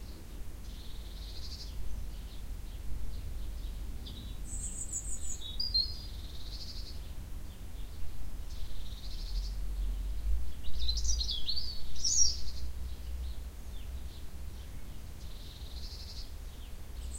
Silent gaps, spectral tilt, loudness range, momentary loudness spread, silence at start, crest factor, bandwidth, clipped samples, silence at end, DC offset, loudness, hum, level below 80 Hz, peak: none; -2 dB/octave; 12 LU; 16 LU; 0 s; 20 dB; 16 kHz; under 0.1%; 0 s; under 0.1%; -39 LUFS; none; -40 dBFS; -12 dBFS